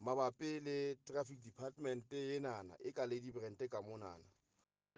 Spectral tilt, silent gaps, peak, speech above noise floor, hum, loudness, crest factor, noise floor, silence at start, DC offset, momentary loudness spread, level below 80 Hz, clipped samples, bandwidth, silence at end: -5.5 dB/octave; none; -26 dBFS; 40 dB; none; -45 LUFS; 20 dB; -85 dBFS; 0 s; under 0.1%; 10 LU; -84 dBFS; under 0.1%; 9.6 kHz; 0.75 s